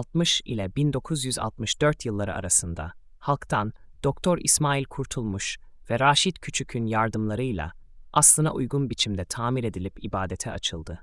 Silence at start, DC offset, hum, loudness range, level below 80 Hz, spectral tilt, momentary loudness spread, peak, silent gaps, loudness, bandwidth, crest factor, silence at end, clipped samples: 0 s; under 0.1%; none; 4 LU; -46 dBFS; -3.5 dB/octave; 12 LU; -6 dBFS; none; -25 LUFS; 12 kHz; 20 dB; 0 s; under 0.1%